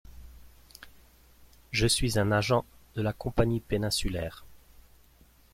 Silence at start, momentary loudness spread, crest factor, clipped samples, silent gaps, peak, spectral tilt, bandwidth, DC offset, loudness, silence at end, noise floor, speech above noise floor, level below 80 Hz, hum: 0.1 s; 15 LU; 20 dB; under 0.1%; none; -10 dBFS; -4.5 dB/octave; 16 kHz; under 0.1%; -29 LUFS; 1 s; -59 dBFS; 32 dB; -44 dBFS; none